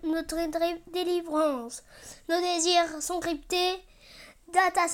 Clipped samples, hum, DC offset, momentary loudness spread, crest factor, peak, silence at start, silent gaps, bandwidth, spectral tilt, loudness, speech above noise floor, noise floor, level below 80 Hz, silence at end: under 0.1%; none; under 0.1%; 14 LU; 18 dB; -10 dBFS; 0 s; none; 17 kHz; -1.5 dB/octave; -28 LUFS; 24 dB; -52 dBFS; -56 dBFS; 0 s